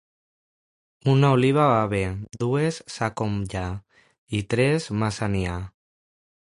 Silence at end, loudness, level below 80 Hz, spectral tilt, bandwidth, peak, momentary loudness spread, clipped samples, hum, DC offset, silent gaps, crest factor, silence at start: 0.8 s; -24 LUFS; -46 dBFS; -6.5 dB/octave; 11.5 kHz; -6 dBFS; 12 LU; under 0.1%; none; under 0.1%; 4.18-4.27 s; 18 dB; 1.05 s